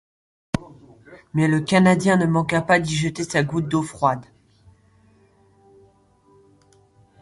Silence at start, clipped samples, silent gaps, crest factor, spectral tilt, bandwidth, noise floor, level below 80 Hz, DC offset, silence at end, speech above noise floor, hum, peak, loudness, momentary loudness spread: 0.55 s; under 0.1%; none; 20 dB; -6 dB/octave; 11.5 kHz; -57 dBFS; -52 dBFS; under 0.1%; 3 s; 38 dB; none; -4 dBFS; -20 LUFS; 13 LU